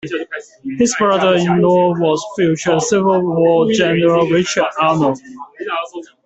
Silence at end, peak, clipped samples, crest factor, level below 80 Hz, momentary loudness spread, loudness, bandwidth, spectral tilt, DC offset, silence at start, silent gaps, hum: 0.2 s; -2 dBFS; under 0.1%; 14 dB; -54 dBFS; 14 LU; -15 LUFS; 8.4 kHz; -5 dB/octave; under 0.1%; 0.05 s; none; none